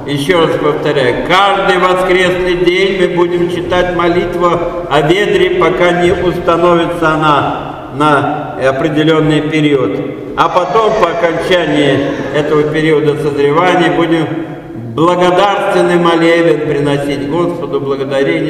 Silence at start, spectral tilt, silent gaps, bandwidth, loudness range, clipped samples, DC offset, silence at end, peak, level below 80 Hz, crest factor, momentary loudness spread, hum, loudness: 0 s; -6 dB/octave; none; 13 kHz; 1 LU; 0.2%; under 0.1%; 0 s; 0 dBFS; -36 dBFS; 10 dB; 6 LU; none; -11 LUFS